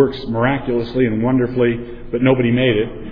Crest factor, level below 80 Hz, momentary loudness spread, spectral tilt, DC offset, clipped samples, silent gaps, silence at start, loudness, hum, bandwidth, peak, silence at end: 14 dB; -36 dBFS; 6 LU; -10 dB/octave; under 0.1%; under 0.1%; none; 0 s; -17 LUFS; none; 5.2 kHz; -2 dBFS; 0 s